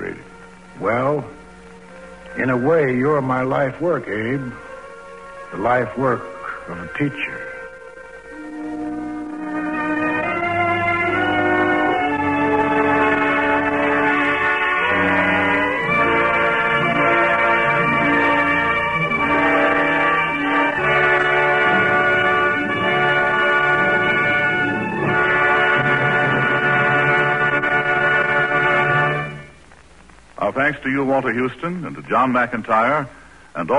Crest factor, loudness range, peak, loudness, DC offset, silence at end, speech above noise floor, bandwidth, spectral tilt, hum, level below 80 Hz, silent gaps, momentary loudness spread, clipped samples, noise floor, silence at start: 14 dB; 8 LU; -6 dBFS; -17 LUFS; 0.2%; 0 s; 27 dB; 11 kHz; -6.5 dB/octave; none; -48 dBFS; none; 14 LU; under 0.1%; -46 dBFS; 0 s